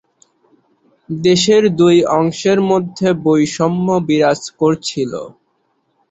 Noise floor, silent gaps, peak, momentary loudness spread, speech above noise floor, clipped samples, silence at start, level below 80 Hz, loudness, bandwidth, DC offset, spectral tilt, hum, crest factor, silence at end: -64 dBFS; none; -2 dBFS; 10 LU; 50 dB; under 0.1%; 1.1 s; -54 dBFS; -14 LUFS; 8.2 kHz; under 0.1%; -5.5 dB/octave; none; 14 dB; 0.8 s